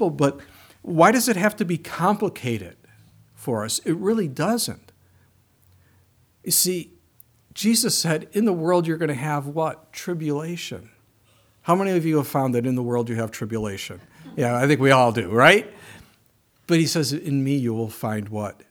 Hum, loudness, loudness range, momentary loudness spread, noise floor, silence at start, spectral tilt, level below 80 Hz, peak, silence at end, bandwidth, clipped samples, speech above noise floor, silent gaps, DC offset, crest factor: none; -22 LUFS; 7 LU; 17 LU; -62 dBFS; 0 s; -4.5 dB/octave; -62 dBFS; 0 dBFS; 0.2 s; over 20 kHz; under 0.1%; 40 dB; none; under 0.1%; 22 dB